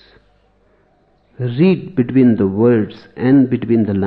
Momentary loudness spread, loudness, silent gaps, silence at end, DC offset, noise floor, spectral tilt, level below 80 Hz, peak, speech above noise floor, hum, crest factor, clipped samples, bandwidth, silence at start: 9 LU; -15 LUFS; none; 0 s; under 0.1%; -56 dBFS; -11.5 dB/octave; -54 dBFS; -2 dBFS; 42 dB; none; 14 dB; under 0.1%; 5.4 kHz; 1.4 s